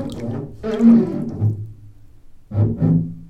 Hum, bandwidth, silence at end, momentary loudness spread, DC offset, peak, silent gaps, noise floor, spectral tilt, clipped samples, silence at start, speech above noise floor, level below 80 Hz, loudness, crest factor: none; 7.8 kHz; 0 s; 15 LU; under 0.1%; -2 dBFS; none; -41 dBFS; -10 dB/octave; under 0.1%; 0 s; 26 dB; -44 dBFS; -19 LUFS; 16 dB